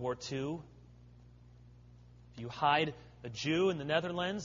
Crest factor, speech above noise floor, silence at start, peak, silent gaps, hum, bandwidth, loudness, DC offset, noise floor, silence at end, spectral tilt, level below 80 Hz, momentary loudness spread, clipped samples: 22 dB; 23 dB; 0 s; -14 dBFS; none; 60 Hz at -55 dBFS; 7.2 kHz; -34 LUFS; under 0.1%; -57 dBFS; 0 s; -3.5 dB/octave; -62 dBFS; 16 LU; under 0.1%